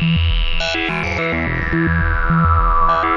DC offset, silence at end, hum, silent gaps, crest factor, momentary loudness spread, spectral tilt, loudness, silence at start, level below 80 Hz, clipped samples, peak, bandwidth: under 0.1%; 0 s; none; none; 14 dB; 4 LU; -6.5 dB/octave; -17 LUFS; 0 s; -22 dBFS; under 0.1%; -2 dBFS; 7.4 kHz